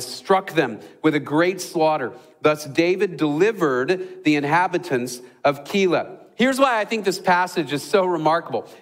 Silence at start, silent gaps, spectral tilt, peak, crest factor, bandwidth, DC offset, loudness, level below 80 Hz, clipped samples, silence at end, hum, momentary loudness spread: 0 s; none; -5 dB/octave; -4 dBFS; 16 dB; 16 kHz; under 0.1%; -21 LUFS; -68 dBFS; under 0.1%; 0.05 s; none; 6 LU